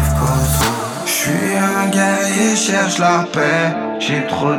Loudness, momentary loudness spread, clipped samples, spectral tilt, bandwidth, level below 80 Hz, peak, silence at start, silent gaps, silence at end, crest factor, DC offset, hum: -15 LUFS; 4 LU; under 0.1%; -4 dB/octave; over 20 kHz; -30 dBFS; -2 dBFS; 0 s; none; 0 s; 14 dB; under 0.1%; none